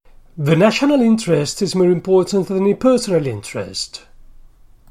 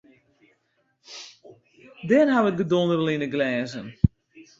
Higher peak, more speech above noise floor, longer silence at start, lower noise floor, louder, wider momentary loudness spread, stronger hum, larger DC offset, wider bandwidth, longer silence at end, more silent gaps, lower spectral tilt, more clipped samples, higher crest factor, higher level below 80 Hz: about the same, -2 dBFS vs -2 dBFS; second, 28 dB vs 48 dB; second, 0.35 s vs 1.1 s; second, -44 dBFS vs -70 dBFS; first, -16 LUFS vs -23 LUFS; second, 12 LU vs 21 LU; neither; neither; first, 15 kHz vs 7.8 kHz; first, 0.9 s vs 0.2 s; neither; second, -5.5 dB/octave vs -7 dB/octave; neither; second, 16 dB vs 22 dB; about the same, -48 dBFS vs -46 dBFS